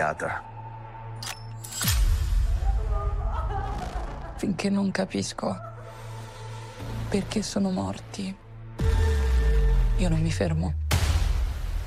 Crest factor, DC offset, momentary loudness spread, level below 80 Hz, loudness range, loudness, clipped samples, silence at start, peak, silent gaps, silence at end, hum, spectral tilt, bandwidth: 16 dB; under 0.1%; 15 LU; -28 dBFS; 5 LU; -28 LUFS; under 0.1%; 0 s; -10 dBFS; none; 0 s; none; -5.5 dB/octave; 16 kHz